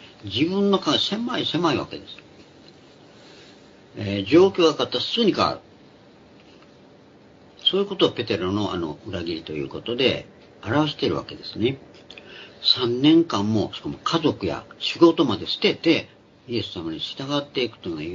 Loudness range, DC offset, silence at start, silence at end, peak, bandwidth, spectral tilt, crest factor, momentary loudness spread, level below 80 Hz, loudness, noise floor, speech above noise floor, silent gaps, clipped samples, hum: 5 LU; under 0.1%; 0 s; 0 s; -2 dBFS; 7.6 kHz; -5.5 dB/octave; 22 dB; 17 LU; -60 dBFS; -22 LUFS; -50 dBFS; 28 dB; none; under 0.1%; none